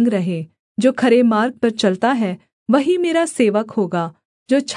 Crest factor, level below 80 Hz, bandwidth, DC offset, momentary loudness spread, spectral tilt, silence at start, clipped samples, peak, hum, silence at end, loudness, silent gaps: 14 dB; -70 dBFS; 11 kHz; under 0.1%; 10 LU; -5.5 dB/octave; 0 s; under 0.1%; -2 dBFS; none; 0 s; -18 LUFS; 0.59-0.75 s, 2.53-2.66 s, 4.25-4.46 s